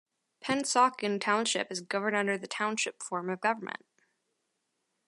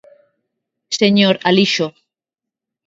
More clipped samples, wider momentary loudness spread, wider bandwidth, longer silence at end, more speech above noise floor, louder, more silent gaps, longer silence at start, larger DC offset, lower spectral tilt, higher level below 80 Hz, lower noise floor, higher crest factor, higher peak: neither; about the same, 10 LU vs 11 LU; first, 11.5 kHz vs 7.8 kHz; first, 1.3 s vs 0.95 s; second, 50 dB vs 72 dB; second, -30 LUFS vs -15 LUFS; neither; second, 0.4 s vs 0.9 s; neither; second, -2.5 dB/octave vs -4.5 dB/octave; second, -80 dBFS vs -64 dBFS; second, -81 dBFS vs -86 dBFS; about the same, 20 dB vs 18 dB; second, -12 dBFS vs 0 dBFS